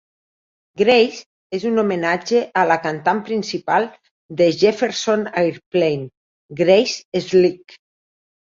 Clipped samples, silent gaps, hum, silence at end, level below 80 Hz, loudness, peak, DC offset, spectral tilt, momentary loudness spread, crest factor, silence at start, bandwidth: under 0.1%; 1.26-1.50 s, 4.11-4.29 s, 5.66-5.71 s, 6.17-6.49 s, 7.05-7.12 s; none; 1 s; -62 dBFS; -18 LUFS; -2 dBFS; under 0.1%; -5 dB/octave; 11 LU; 18 dB; 0.75 s; 7.6 kHz